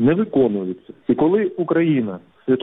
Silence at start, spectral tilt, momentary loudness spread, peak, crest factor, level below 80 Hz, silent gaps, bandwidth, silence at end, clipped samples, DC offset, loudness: 0 s; -11 dB/octave; 12 LU; -6 dBFS; 14 dB; -56 dBFS; none; 3.9 kHz; 0 s; under 0.1%; under 0.1%; -20 LUFS